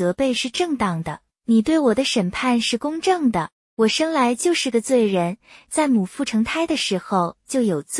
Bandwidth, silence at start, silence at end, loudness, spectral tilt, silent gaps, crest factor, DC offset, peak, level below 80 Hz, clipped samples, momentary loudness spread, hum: 12 kHz; 0 s; 0 s; -20 LUFS; -4.5 dB/octave; 3.52-3.77 s; 14 dB; under 0.1%; -6 dBFS; -54 dBFS; under 0.1%; 7 LU; none